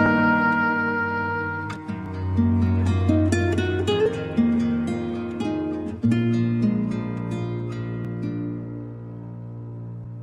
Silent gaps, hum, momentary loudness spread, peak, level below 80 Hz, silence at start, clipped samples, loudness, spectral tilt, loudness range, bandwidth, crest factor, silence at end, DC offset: none; none; 15 LU; -6 dBFS; -54 dBFS; 0 s; under 0.1%; -23 LUFS; -7.5 dB/octave; 6 LU; 10.5 kHz; 16 dB; 0 s; under 0.1%